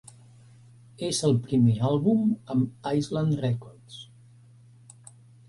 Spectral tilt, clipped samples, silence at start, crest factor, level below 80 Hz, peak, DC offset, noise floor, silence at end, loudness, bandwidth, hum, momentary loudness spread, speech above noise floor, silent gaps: -6.5 dB/octave; under 0.1%; 1 s; 16 dB; -60 dBFS; -10 dBFS; under 0.1%; -53 dBFS; 1.45 s; -26 LUFS; 11.5 kHz; none; 20 LU; 29 dB; none